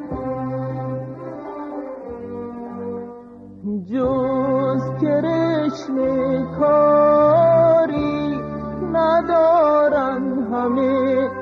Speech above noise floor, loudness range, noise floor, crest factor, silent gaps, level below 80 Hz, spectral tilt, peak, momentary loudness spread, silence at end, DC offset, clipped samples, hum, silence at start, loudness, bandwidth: 21 dB; 12 LU; -39 dBFS; 12 dB; none; -48 dBFS; -8.5 dB/octave; -6 dBFS; 18 LU; 0 s; under 0.1%; under 0.1%; none; 0 s; -18 LUFS; 6.6 kHz